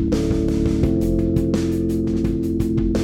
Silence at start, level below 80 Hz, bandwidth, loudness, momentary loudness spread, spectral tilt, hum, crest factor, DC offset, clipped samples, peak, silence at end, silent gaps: 0 s; -28 dBFS; 16 kHz; -20 LUFS; 2 LU; -8 dB/octave; none; 14 dB; under 0.1%; under 0.1%; -4 dBFS; 0 s; none